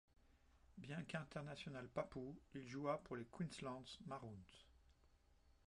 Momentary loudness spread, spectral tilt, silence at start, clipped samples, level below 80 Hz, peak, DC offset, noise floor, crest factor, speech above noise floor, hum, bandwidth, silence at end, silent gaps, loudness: 14 LU; -6 dB/octave; 0.2 s; under 0.1%; -74 dBFS; -32 dBFS; under 0.1%; -74 dBFS; 22 dB; 24 dB; none; 11 kHz; 0.15 s; none; -51 LUFS